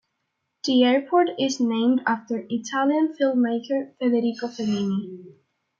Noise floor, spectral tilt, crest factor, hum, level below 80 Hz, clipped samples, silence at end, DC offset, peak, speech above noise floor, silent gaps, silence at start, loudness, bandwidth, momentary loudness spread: -77 dBFS; -5 dB/octave; 16 dB; none; -74 dBFS; under 0.1%; 0.5 s; under 0.1%; -8 dBFS; 55 dB; none; 0.65 s; -23 LUFS; 7.4 kHz; 9 LU